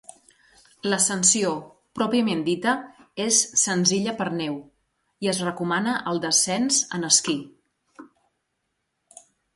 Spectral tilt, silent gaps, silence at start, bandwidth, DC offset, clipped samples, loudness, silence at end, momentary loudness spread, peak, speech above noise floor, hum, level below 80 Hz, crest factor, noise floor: -2.5 dB/octave; none; 0.85 s; 11.5 kHz; under 0.1%; under 0.1%; -22 LUFS; 1.5 s; 12 LU; -4 dBFS; 54 dB; none; -68 dBFS; 22 dB; -77 dBFS